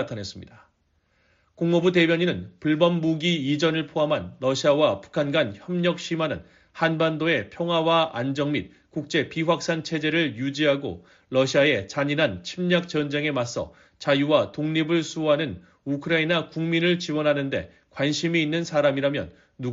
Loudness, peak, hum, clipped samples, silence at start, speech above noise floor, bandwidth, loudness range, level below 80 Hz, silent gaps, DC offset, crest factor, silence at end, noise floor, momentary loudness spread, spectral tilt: -24 LUFS; -6 dBFS; none; under 0.1%; 0 s; 44 dB; 7.8 kHz; 2 LU; -60 dBFS; none; under 0.1%; 18 dB; 0 s; -68 dBFS; 11 LU; -4 dB/octave